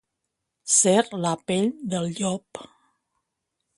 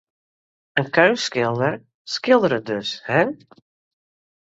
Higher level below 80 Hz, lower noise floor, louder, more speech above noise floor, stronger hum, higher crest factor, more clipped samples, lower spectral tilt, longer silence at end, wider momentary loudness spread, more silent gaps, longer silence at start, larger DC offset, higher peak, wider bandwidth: second, -68 dBFS vs -62 dBFS; second, -81 dBFS vs under -90 dBFS; second, -23 LUFS vs -20 LUFS; second, 58 dB vs over 70 dB; neither; about the same, 22 dB vs 20 dB; neither; second, -3.5 dB/octave vs -5 dB/octave; about the same, 1.1 s vs 1.05 s; first, 21 LU vs 10 LU; second, none vs 1.94-2.05 s; about the same, 0.65 s vs 0.75 s; neither; about the same, -4 dBFS vs -2 dBFS; first, 11.5 kHz vs 8 kHz